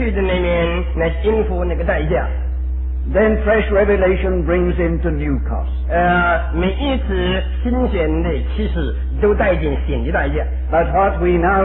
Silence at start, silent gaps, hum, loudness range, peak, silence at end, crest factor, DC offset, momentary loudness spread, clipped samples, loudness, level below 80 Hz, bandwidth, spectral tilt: 0 s; none; none; 2 LU; -4 dBFS; 0 s; 12 dB; under 0.1%; 6 LU; under 0.1%; -18 LUFS; -20 dBFS; 4 kHz; -11.5 dB/octave